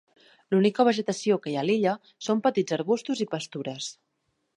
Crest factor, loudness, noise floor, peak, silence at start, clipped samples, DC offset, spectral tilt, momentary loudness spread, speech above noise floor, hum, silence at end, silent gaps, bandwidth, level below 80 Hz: 20 dB; -26 LUFS; -76 dBFS; -8 dBFS; 0.5 s; under 0.1%; under 0.1%; -5.5 dB/octave; 11 LU; 50 dB; none; 0.65 s; none; 11 kHz; -76 dBFS